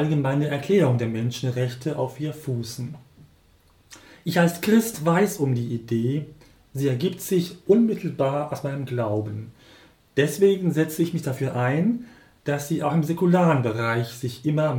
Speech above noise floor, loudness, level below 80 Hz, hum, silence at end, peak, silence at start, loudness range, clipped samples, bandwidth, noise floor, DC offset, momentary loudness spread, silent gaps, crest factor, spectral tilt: 35 dB; -24 LUFS; -62 dBFS; none; 0 s; -6 dBFS; 0 s; 3 LU; under 0.1%; 18.5 kHz; -58 dBFS; under 0.1%; 11 LU; none; 18 dB; -6.5 dB/octave